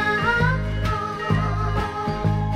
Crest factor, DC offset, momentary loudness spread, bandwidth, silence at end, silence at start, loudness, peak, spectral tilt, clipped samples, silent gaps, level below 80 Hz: 14 dB; under 0.1%; 5 LU; 11.5 kHz; 0 s; 0 s; -23 LUFS; -8 dBFS; -7 dB/octave; under 0.1%; none; -32 dBFS